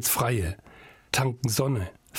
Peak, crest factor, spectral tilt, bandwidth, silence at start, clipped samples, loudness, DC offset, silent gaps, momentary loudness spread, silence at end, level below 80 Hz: -4 dBFS; 24 dB; -4 dB/octave; 17 kHz; 0 s; under 0.1%; -27 LUFS; under 0.1%; none; 9 LU; 0 s; -50 dBFS